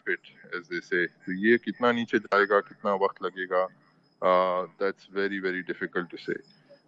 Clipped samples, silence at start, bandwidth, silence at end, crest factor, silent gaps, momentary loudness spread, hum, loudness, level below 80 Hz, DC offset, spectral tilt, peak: under 0.1%; 0.05 s; 7.6 kHz; 0.15 s; 20 dB; none; 11 LU; none; -28 LUFS; -76 dBFS; under 0.1%; -6.5 dB/octave; -8 dBFS